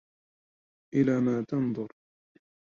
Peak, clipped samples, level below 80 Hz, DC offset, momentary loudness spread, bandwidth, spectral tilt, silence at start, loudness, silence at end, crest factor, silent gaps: -12 dBFS; under 0.1%; -68 dBFS; under 0.1%; 11 LU; 7 kHz; -9 dB/octave; 0.95 s; -28 LUFS; 0.75 s; 18 dB; none